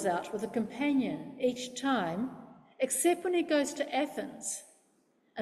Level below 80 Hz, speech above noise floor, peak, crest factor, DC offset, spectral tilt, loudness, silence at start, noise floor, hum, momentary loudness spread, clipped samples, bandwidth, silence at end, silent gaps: -74 dBFS; 39 dB; -16 dBFS; 16 dB; under 0.1%; -3.5 dB/octave; -32 LUFS; 0 s; -70 dBFS; none; 9 LU; under 0.1%; 15.5 kHz; 0 s; none